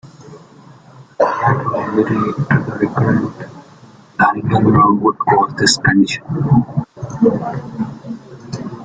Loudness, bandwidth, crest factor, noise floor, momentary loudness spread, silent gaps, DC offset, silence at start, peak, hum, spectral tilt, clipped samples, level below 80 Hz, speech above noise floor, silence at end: -15 LUFS; 9.4 kHz; 16 dB; -42 dBFS; 17 LU; none; under 0.1%; 0.05 s; 0 dBFS; none; -5.5 dB/octave; under 0.1%; -46 dBFS; 28 dB; 0 s